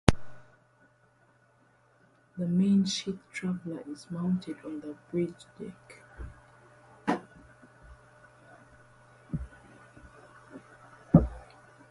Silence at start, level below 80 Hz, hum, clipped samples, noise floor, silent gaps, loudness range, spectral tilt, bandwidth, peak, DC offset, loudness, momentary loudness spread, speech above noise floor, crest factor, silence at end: 0.05 s; -46 dBFS; none; under 0.1%; -65 dBFS; none; 16 LU; -6.5 dB/octave; 11.5 kHz; 0 dBFS; under 0.1%; -31 LUFS; 29 LU; 33 dB; 32 dB; 0.45 s